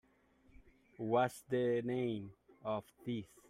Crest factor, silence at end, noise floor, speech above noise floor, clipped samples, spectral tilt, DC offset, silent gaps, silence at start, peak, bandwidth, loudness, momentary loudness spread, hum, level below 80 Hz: 20 dB; 0.25 s; -69 dBFS; 32 dB; under 0.1%; -6.5 dB/octave; under 0.1%; none; 1 s; -20 dBFS; 16 kHz; -38 LUFS; 12 LU; none; -72 dBFS